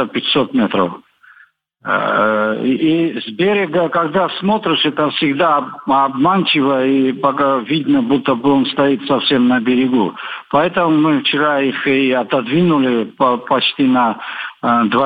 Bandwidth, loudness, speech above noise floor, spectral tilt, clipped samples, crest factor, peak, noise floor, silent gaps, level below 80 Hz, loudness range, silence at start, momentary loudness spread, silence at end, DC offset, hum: 5 kHz; -15 LUFS; 35 dB; -8 dB/octave; under 0.1%; 14 dB; 0 dBFS; -50 dBFS; none; -58 dBFS; 2 LU; 0 s; 4 LU; 0 s; under 0.1%; none